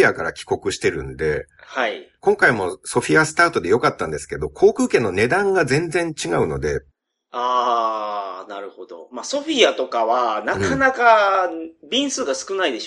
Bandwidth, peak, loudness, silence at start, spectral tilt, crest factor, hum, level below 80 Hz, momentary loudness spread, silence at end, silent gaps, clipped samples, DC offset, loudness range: 11.5 kHz; 0 dBFS; -19 LUFS; 0 s; -4 dB/octave; 20 dB; none; -46 dBFS; 13 LU; 0 s; none; under 0.1%; under 0.1%; 4 LU